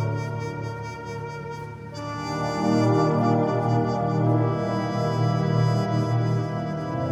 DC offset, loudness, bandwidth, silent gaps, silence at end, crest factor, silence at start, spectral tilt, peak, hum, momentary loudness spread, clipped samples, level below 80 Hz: under 0.1%; -24 LUFS; 8.4 kHz; none; 0 s; 14 dB; 0 s; -7.5 dB/octave; -10 dBFS; none; 13 LU; under 0.1%; -54 dBFS